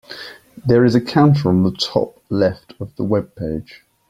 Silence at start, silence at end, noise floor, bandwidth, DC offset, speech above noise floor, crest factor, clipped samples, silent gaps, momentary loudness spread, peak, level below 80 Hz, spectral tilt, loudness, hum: 0.1 s; 0.5 s; -37 dBFS; 13 kHz; under 0.1%; 20 dB; 16 dB; under 0.1%; none; 19 LU; -2 dBFS; -48 dBFS; -7.5 dB/octave; -17 LUFS; none